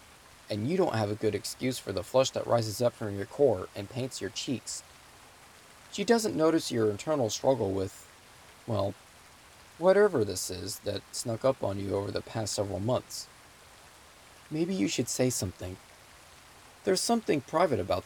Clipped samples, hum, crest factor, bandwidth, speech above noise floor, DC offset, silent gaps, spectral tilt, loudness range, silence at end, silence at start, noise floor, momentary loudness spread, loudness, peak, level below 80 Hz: under 0.1%; none; 20 dB; 18 kHz; 25 dB; under 0.1%; none; -4.5 dB/octave; 4 LU; 0 s; 0.5 s; -54 dBFS; 12 LU; -30 LUFS; -10 dBFS; -64 dBFS